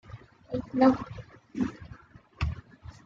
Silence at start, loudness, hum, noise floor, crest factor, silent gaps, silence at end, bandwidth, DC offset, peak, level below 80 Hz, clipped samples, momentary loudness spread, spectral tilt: 0.1 s; -29 LUFS; none; -51 dBFS; 22 dB; none; 0.15 s; 7.2 kHz; under 0.1%; -10 dBFS; -46 dBFS; under 0.1%; 26 LU; -8 dB/octave